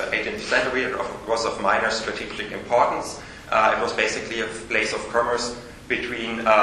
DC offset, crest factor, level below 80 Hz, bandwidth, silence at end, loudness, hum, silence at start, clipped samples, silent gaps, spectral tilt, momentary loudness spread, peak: under 0.1%; 22 dB; -50 dBFS; 12.5 kHz; 0 s; -23 LUFS; none; 0 s; under 0.1%; none; -3 dB/octave; 9 LU; -2 dBFS